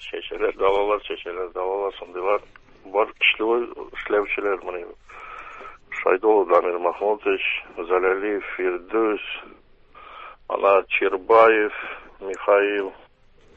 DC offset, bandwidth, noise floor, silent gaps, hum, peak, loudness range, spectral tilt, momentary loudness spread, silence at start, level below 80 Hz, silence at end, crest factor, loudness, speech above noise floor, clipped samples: under 0.1%; 7.8 kHz; -53 dBFS; none; none; -2 dBFS; 4 LU; -4.5 dB/octave; 17 LU; 0 s; -56 dBFS; 0.6 s; 22 dB; -22 LUFS; 31 dB; under 0.1%